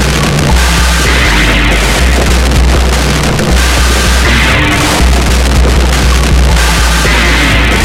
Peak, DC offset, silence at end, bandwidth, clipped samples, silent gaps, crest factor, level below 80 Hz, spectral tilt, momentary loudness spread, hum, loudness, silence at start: 0 dBFS; under 0.1%; 0 s; 16 kHz; 0.4%; none; 8 dB; -10 dBFS; -4 dB/octave; 2 LU; none; -8 LUFS; 0 s